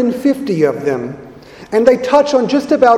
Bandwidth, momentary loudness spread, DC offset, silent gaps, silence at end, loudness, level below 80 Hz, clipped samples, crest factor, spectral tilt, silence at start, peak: 14.5 kHz; 10 LU; under 0.1%; none; 0 s; -14 LUFS; -50 dBFS; 0.1%; 14 dB; -6 dB/octave; 0 s; 0 dBFS